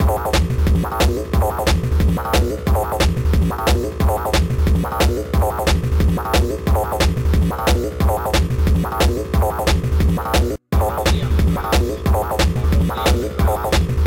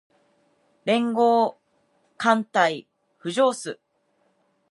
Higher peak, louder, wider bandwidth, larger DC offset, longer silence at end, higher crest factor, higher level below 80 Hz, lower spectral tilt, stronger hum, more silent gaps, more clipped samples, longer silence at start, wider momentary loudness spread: about the same, -6 dBFS vs -4 dBFS; first, -18 LUFS vs -23 LUFS; first, 17 kHz vs 11.5 kHz; first, 0.2% vs under 0.1%; second, 0 s vs 0.95 s; second, 10 dB vs 20 dB; first, -20 dBFS vs -80 dBFS; about the same, -5.5 dB/octave vs -4.5 dB/octave; neither; neither; neither; second, 0 s vs 0.85 s; second, 2 LU vs 16 LU